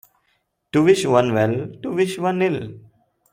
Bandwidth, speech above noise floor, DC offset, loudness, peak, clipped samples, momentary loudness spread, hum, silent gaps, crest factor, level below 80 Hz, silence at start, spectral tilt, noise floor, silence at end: 16 kHz; 50 dB; under 0.1%; -20 LUFS; -2 dBFS; under 0.1%; 11 LU; none; none; 18 dB; -60 dBFS; 0.75 s; -6 dB/octave; -68 dBFS; 0.55 s